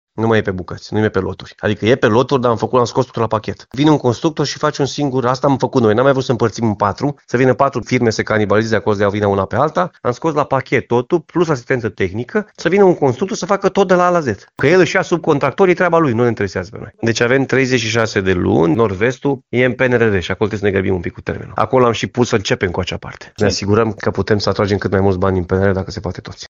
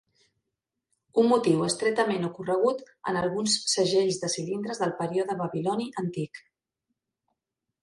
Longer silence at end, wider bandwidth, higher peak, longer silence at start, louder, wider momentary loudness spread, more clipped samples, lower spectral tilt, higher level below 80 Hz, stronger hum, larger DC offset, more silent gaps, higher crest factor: second, 0.05 s vs 1.45 s; second, 7.8 kHz vs 11.5 kHz; first, 0 dBFS vs -10 dBFS; second, 0.15 s vs 1.15 s; first, -16 LUFS vs -27 LUFS; about the same, 8 LU vs 9 LU; neither; first, -6 dB/octave vs -4 dB/octave; first, -46 dBFS vs -68 dBFS; neither; neither; neither; about the same, 16 dB vs 18 dB